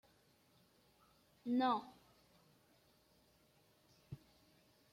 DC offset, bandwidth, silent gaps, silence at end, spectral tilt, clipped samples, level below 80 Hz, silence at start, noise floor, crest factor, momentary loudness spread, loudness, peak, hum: under 0.1%; 16 kHz; none; 0.8 s; -6 dB/octave; under 0.1%; -80 dBFS; 1.45 s; -73 dBFS; 20 dB; 21 LU; -39 LUFS; -26 dBFS; none